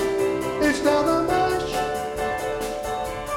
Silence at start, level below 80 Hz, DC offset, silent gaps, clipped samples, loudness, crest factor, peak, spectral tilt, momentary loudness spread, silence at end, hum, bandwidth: 0 s; -44 dBFS; under 0.1%; none; under 0.1%; -23 LUFS; 16 dB; -6 dBFS; -4.5 dB/octave; 8 LU; 0 s; none; 17 kHz